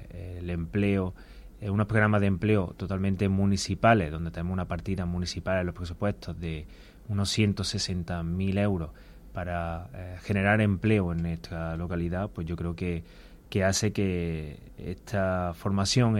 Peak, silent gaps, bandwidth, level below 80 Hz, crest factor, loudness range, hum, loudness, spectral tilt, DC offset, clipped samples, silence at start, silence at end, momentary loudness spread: -6 dBFS; none; 13.5 kHz; -46 dBFS; 22 dB; 4 LU; none; -29 LUFS; -5.5 dB/octave; under 0.1%; under 0.1%; 0 s; 0 s; 14 LU